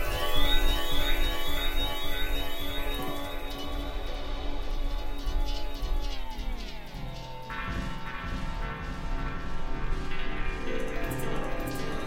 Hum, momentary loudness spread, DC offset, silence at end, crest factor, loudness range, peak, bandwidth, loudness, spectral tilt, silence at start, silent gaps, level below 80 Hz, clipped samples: none; 9 LU; under 0.1%; 0 s; 18 dB; 6 LU; -10 dBFS; 16.5 kHz; -34 LUFS; -4 dB/octave; 0 s; none; -30 dBFS; under 0.1%